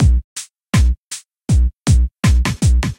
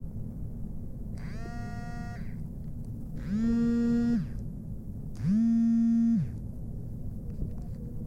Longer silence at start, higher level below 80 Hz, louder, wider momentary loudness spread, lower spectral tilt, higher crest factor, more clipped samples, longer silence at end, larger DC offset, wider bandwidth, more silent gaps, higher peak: about the same, 0 s vs 0 s; first, -16 dBFS vs -42 dBFS; first, -17 LUFS vs -32 LUFS; about the same, 14 LU vs 16 LU; second, -5.5 dB/octave vs -9 dB/octave; about the same, 12 dB vs 12 dB; neither; about the same, 0.05 s vs 0 s; neither; first, 15.5 kHz vs 7.6 kHz; first, 0.24-0.36 s, 0.98-1.11 s vs none; first, -2 dBFS vs -18 dBFS